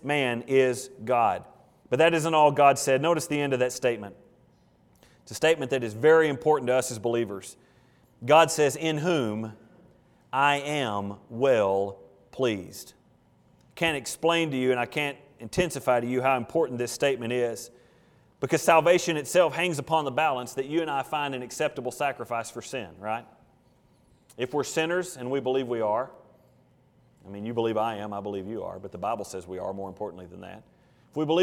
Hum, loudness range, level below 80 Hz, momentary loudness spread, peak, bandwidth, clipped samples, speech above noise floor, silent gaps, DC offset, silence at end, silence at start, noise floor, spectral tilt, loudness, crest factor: none; 8 LU; -64 dBFS; 15 LU; -6 dBFS; 18 kHz; under 0.1%; 36 dB; none; under 0.1%; 0 s; 0.05 s; -62 dBFS; -4.5 dB/octave; -26 LUFS; 22 dB